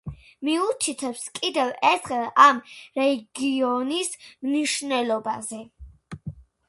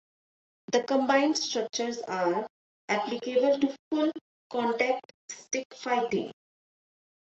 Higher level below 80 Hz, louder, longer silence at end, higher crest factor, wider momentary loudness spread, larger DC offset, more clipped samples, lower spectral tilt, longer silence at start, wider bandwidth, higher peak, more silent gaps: first, -56 dBFS vs -76 dBFS; first, -23 LUFS vs -29 LUFS; second, 0.25 s vs 0.9 s; about the same, 22 dB vs 20 dB; first, 22 LU vs 10 LU; neither; neither; about the same, -3 dB/octave vs -3 dB/octave; second, 0.05 s vs 0.7 s; first, 11.5 kHz vs 8.2 kHz; first, -2 dBFS vs -10 dBFS; second, none vs 2.50-2.88 s, 3.79-3.91 s, 4.21-4.50 s, 5.05-5.29 s, 5.65-5.70 s